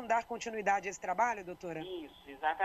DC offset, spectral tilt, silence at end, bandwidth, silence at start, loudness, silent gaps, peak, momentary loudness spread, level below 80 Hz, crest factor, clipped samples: under 0.1%; -3.5 dB/octave; 0 s; 12.5 kHz; 0 s; -36 LUFS; none; -18 dBFS; 11 LU; -68 dBFS; 18 dB; under 0.1%